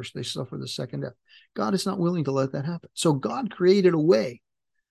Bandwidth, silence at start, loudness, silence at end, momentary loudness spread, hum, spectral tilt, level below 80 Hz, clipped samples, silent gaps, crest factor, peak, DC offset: 12.5 kHz; 0 s; -25 LUFS; 0.55 s; 14 LU; none; -6 dB/octave; -68 dBFS; under 0.1%; none; 18 dB; -8 dBFS; under 0.1%